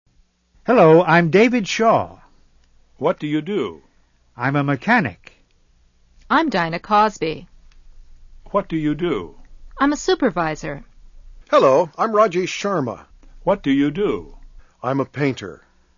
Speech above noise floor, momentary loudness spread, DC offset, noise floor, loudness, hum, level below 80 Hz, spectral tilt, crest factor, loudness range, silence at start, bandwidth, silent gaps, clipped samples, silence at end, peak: 40 dB; 15 LU; under 0.1%; -58 dBFS; -19 LUFS; none; -46 dBFS; -6 dB/octave; 18 dB; 6 LU; 0.65 s; 7.4 kHz; none; under 0.1%; 0.4 s; -2 dBFS